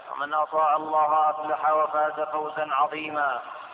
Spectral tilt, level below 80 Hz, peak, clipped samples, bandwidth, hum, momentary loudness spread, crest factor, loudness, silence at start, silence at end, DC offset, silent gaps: -7 dB/octave; -76 dBFS; -12 dBFS; under 0.1%; 4 kHz; none; 6 LU; 14 dB; -25 LUFS; 0 s; 0 s; under 0.1%; none